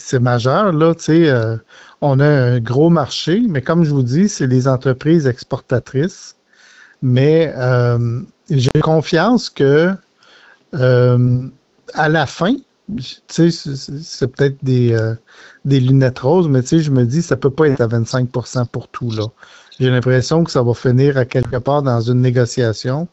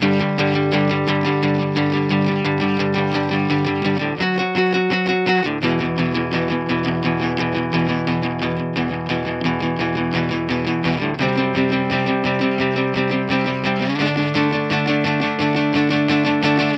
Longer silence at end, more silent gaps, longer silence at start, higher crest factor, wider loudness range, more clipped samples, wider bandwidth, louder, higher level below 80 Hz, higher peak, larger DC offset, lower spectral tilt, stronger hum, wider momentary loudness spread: about the same, 0.05 s vs 0 s; neither; about the same, 0 s vs 0 s; about the same, 12 dB vs 14 dB; about the same, 3 LU vs 2 LU; neither; about the same, 8.2 kHz vs 8 kHz; first, -15 LUFS vs -19 LUFS; about the same, -46 dBFS vs -50 dBFS; about the same, -2 dBFS vs -4 dBFS; neither; about the same, -7 dB/octave vs -7 dB/octave; neither; first, 11 LU vs 4 LU